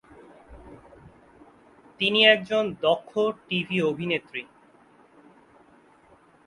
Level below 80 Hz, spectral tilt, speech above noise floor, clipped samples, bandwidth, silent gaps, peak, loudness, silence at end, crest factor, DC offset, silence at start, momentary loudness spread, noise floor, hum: -62 dBFS; -5.5 dB/octave; 33 dB; under 0.1%; 11.5 kHz; none; -4 dBFS; -23 LUFS; 2.05 s; 24 dB; under 0.1%; 0.5 s; 12 LU; -57 dBFS; none